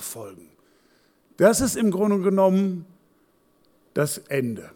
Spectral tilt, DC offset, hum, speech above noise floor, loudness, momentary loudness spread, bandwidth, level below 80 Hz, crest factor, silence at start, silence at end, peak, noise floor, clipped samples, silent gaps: -5.5 dB/octave; under 0.1%; none; 41 dB; -22 LUFS; 16 LU; 18.5 kHz; -54 dBFS; 18 dB; 0 s; 0.1 s; -6 dBFS; -62 dBFS; under 0.1%; none